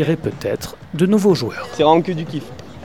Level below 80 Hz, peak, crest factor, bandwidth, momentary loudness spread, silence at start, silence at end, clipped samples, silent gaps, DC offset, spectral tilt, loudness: -48 dBFS; 0 dBFS; 18 dB; 18 kHz; 14 LU; 0 s; 0 s; under 0.1%; none; 0.5%; -6.5 dB/octave; -18 LUFS